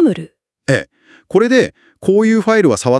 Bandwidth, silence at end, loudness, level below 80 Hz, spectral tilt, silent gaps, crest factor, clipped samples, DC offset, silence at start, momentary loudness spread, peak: 12 kHz; 0 s; -14 LUFS; -56 dBFS; -6 dB/octave; none; 14 dB; under 0.1%; under 0.1%; 0 s; 10 LU; 0 dBFS